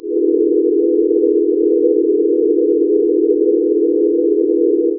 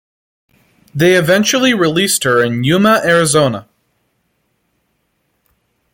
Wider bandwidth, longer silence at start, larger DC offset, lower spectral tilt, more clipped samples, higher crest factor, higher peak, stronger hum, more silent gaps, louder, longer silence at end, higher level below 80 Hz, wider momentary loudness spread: second, 0.6 kHz vs 17 kHz; second, 0.05 s vs 0.95 s; neither; first, -7 dB/octave vs -4 dB/octave; neither; about the same, 10 dB vs 14 dB; second, -4 dBFS vs 0 dBFS; neither; neither; about the same, -14 LUFS vs -12 LUFS; second, 0 s vs 2.3 s; second, -62 dBFS vs -52 dBFS; second, 1 LU vs 4 LU